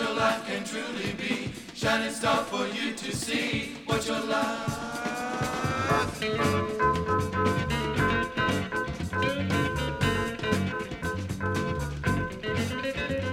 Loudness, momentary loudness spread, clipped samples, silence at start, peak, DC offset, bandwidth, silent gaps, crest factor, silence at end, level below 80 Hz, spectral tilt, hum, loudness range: -28 LUFS; 6 LU; under 0.1%; 0 s; -10 dBFS; under 0.1%; 17.5 kHz; none; 18 dB; 0 s; -46 dBFS; -5 dB/octave; none; 3 LU